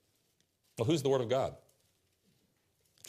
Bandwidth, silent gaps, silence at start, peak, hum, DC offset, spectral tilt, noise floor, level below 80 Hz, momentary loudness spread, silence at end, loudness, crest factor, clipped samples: 15 kHz; none; 0.75 s; -18 dBFS; none; under 0.1%; -6 dB/octave; -76 dBFS; -72 dBFS; 9 LU; 1.5 s; -33 LUFS; 18 dB; under 0.1%